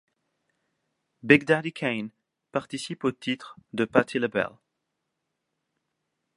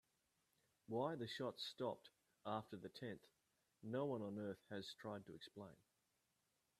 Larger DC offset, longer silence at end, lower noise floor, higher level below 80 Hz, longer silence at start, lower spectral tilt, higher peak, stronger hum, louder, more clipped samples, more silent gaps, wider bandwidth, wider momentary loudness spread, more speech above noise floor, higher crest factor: neither; first, 1.85 s vs 1.05 s; second, -81 dBFS vs -87 dBFS; first, -66 dBFS vs -88 dBFS; first, 1.25 s vs 0.9 s; about the same, -5.5 dB/octave vs -6 dB/octave; first, -2 dBFS vs -30 dBFS; neither; first, -26 LUFS vs -50 LUFS; neither; neither; second, 11.5 kHz vs 13.5 kHz; about the same, 14 LU vs 13 LU; first, 55 dB vs 38 dB; first, 28 dB vs 22 dB